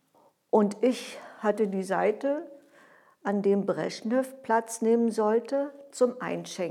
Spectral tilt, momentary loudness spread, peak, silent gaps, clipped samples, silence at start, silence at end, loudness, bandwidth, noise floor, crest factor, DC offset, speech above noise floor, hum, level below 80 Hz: -5.5 dB/octave; 9 LU; -10 dBFS; none; under 0.1%; 0.55 s; 0 s; -28 LUFS; 14 kHz; -64 dBFS; 18 dB; under 0.1%; 37 dB; none; under -90 dBFS